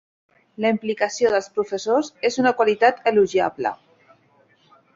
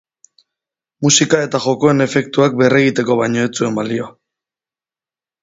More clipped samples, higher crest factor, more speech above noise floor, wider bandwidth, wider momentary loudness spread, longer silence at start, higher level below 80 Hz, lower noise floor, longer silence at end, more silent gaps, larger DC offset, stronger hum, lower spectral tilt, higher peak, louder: neither; about the same, 18 dB vs 16 dB; second, 39 dB vs over 76 dB; about the same, 7.8 kHz vs 8 kHz; about the same, 8 LU vs 8 LU; second, 0.6 s vs 1 s; second, -64 dBFS vs -56 dBFS; second, -59 dBFS vs under -90 dBFS; about the same, 1.2 s vs 1.3 s; neither; neither; neither; about the same, -4 dB/octave vs -4 dB/octave; second, -4 dBFS vs 0 dBFS; second, -21 LUFS vs -15 LUFS